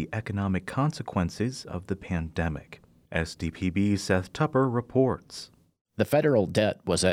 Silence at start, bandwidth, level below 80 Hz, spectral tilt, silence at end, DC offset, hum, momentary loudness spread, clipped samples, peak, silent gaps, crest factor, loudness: 0 s; 16.5 kHz; -48 dBFS; -6 dB/octave; 0 s; under 0.1%; none; 11 LU; under 0.1%; -10 dBFS; 5.81-5.85 s; 18 dB; -28 LUFS